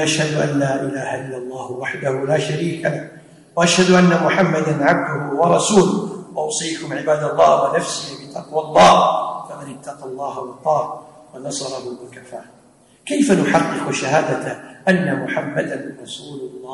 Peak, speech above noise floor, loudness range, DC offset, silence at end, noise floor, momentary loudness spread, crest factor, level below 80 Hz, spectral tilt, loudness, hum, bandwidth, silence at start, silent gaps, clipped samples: -2 dBFS; 33 dB; 7 LU; under 0.1%; 0 s; -51 dBFS; 19 LU; 16 dB; -56 dBFS; -4.5 dB/octave; -18 LUFS; none; 11.5 kHz; 0 s; none; under 0.1%